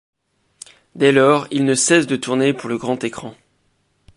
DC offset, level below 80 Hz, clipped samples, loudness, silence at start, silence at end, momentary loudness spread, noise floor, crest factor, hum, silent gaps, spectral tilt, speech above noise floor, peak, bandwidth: under 0.1%; -62 dBFS; under 0.1%; -17 LUFS; 0.95 s; 0.85 s; 16 LU; -64 dBFS; 18 dB; none; none; -4 dB/octave; 47 dB; -2 dBFS; 11.5 kHz